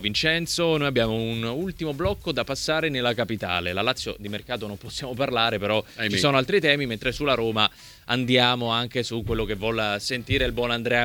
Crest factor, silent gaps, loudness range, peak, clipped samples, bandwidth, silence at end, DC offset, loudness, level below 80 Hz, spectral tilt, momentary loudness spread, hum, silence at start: 20 dB; none; 4 LU; -4 dBFS; under 0.1%; 20 kHz; 0 s; under 0.1%; -24 LUFS; -44 dBFS; -4.5 dB/octave; 9 LU; none; 0 s